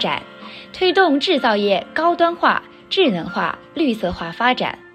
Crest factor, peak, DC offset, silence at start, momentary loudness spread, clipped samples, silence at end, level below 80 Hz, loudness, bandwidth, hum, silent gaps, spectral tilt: 18 dB; 0 dBFS; under 0.1%; 0 s; 9 LU; under 0.1%; 0.15 s; -50 dBFS; -18 LUFS; 12.5 kHz; none; none; -5.5 dB/octave